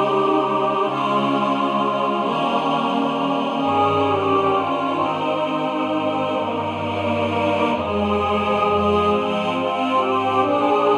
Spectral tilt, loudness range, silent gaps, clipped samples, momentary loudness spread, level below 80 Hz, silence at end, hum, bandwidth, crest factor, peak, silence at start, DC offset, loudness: -6.5 dB/octave; 2 LU; none; under 0.1%; 4 LU; -52 dBFS; 0 s; none; 11 kHz; 14 dB; -6 dBFS; 0 s; under 0.1%; -20 LUFS